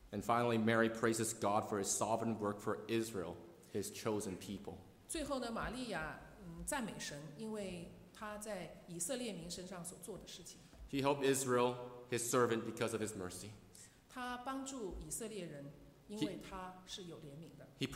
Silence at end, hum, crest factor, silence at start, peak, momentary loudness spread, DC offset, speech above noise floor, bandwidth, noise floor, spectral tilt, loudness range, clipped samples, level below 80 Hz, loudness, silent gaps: 0 s; none; 22 dB; 0 s; -20 dBFS; 18 LU; under 0.1%; 21 dB; 16 kHz; -61 dBFS; -4 dB/octave; 8 LU; under 0.1%; -64 dBFS; -40 LUFS; none